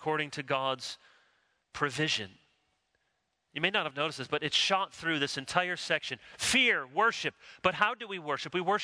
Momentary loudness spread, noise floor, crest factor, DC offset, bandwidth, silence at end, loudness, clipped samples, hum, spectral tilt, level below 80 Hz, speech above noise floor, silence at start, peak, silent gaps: 11 LU; -79 dBFS; 24 dB; under 0.1%; 11 kHz; 0 s; -30 LUFS; under 0.1%; none; -2.5 dB/octave; -68 dBFS; 48 dB; 0 s; -10 dBFS; none